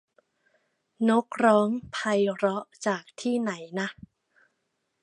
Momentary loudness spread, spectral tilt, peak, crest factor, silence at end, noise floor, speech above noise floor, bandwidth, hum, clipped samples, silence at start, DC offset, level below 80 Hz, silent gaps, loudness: 10 LU; -5.5 dB/octave; -6 dBFS; 22 dB; 1.1 s; -78 dBFS; 52 dB; 10.5 kHz; none; under 0.1%; 1 s; under 0.1%; -68 dBFS; none; -26 LUFS